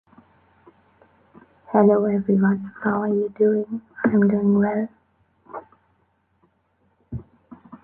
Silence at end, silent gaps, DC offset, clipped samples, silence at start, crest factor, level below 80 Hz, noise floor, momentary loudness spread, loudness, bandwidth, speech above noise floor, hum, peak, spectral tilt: 0.05 s; none; under 0.1%; under 0.1%; 1.7 s; 20 dB; -58 dBFS; -66 dBFS; 20 LU; -21 LUFS; 2.5 kHz; 47 dB; none; -4 dBFS; -13 dB/octave